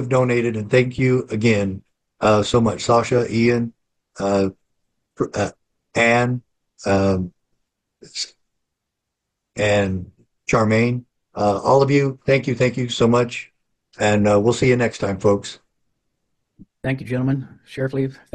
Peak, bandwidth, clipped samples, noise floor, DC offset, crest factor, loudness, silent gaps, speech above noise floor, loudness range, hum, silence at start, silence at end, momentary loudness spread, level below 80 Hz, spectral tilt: -4 dBFS; 10 kHz; under 0.1%; -80 dBFS; under 0.1%; 16 dB; -20 LUFS; none; 61 dB; 6 LU; none; 0 s; 0.2 s; 13 LU; -50 dBFS; -6 dB/octave